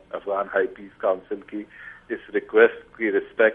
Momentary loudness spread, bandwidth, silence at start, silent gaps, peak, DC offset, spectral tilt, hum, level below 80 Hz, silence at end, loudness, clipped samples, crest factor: 17 LU; 3.8 kHz; 0.15 s; none; -2 dBFS; under 0.1%; -7.5 dB/octave; none; -64 dBFS; 0 s; -24 LUFS; under 0.1%; 22 dB